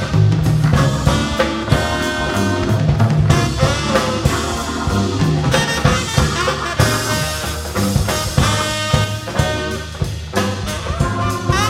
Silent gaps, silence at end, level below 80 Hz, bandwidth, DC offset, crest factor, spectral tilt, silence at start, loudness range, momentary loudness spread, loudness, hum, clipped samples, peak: none; 0 s; -28 dBFS; 16.5 kHz; under 0.1%; 16 dB; -5 dB/octave; 0 s; 2 LU; 6 LU; -17 LUFS; none; under 0.1%; 0 dBFS